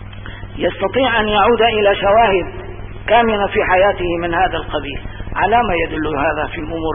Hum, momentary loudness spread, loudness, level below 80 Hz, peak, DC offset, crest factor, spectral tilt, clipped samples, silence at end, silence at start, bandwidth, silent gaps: none; 15 LU; -15 LUFS; -32 dBFS; -2 dBFS; under 0.1%; 14 dB; -10.5 dB/octave; under 0.1%; 0 s; 0 s; 3.7 kHz; none